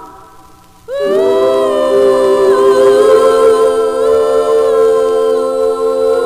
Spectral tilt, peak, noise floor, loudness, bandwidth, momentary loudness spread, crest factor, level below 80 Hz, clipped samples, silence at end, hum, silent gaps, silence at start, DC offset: -4.5 dB/octave; 0 dBFS; -40 dBFS; -10 LUFS; 15 kHz; 5 LU; 10 dB; -46 dBFS; under 0.1%; 0 s; none; none; 0 s; 0.2%